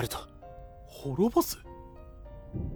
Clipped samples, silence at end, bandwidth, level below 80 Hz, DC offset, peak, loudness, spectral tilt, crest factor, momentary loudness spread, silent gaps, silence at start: under 0.1%; 0 s; over 20 kHz; -48 dBFS; under 0.1%; -12 dBFS; -31 LUFS; -5.5 dB/octave; 20 dB; 23 LU; none; 0 s